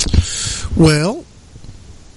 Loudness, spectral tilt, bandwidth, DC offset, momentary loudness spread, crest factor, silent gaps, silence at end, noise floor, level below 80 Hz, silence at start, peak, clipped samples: -15 LUFS; -5 dB/octave; 11.5 kHz; under 0.1%; 9 LU; 16 dB; none; 0.2 s; -37 dBFS; -24 dBFS; 0 s; -2 dBFS; under 0.1%